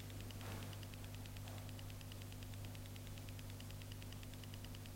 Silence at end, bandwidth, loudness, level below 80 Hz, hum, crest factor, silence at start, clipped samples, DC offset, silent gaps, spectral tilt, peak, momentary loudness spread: 0 s; 16 kHz; -52 LUFS; -58 dBFS; 50 Hz at -50 dBFS; 14 dB; 0 s; under 0.1%; under 0.1%; none; -4.5 dB/octave; -36 dBFS; 2 LU